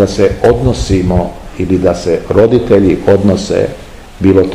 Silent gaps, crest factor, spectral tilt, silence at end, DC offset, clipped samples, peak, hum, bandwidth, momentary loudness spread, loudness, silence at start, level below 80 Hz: none; 10 dB; -7 dB/octave; 0 s; 0.6%; 2%; 0 dBFS; none; 12.5 kHz; 6 LU; -11 LUFS; 0 s; -26 dBFS